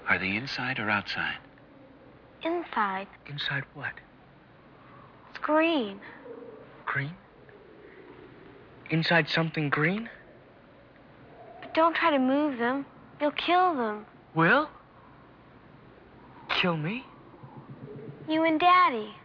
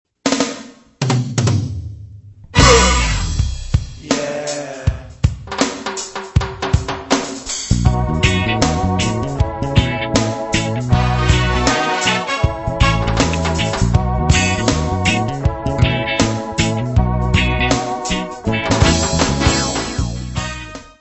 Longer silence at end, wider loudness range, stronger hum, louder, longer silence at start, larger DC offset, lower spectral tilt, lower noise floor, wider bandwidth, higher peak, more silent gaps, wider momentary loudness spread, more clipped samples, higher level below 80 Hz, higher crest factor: about the same, 0.05 s vs 0.1 s; first, 7 LU vs 4 LU; neither; second, -27 LUFS vs -17 LUFS; second, 0 s vs 0.25 s; neither; first, -7 dB/octave vs -4.5 dB/octave; first, -55 dBFS vs -38 dBFS; second, 5.4 kHz vs 8.4 kHz; second, -10 dBFS vs 0 dBFS; neither; first, 23 LU vs 9 LU; neither; second, -66 dBFS vs -24 dBFS; about the same, 18 dB vs 16 dB